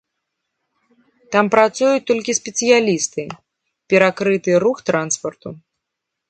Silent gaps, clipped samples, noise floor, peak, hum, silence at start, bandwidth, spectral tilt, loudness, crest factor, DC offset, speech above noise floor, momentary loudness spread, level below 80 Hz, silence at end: none; under 0.1%; -80 dBFS; 0 dBFS; none; 1.3 s; 9.4 kHz; -3.5 dB/octave; -17 LUFS; 18 dB; under 0.1%; 63 dB; 15 LU; -66 dBFS; 0.7 s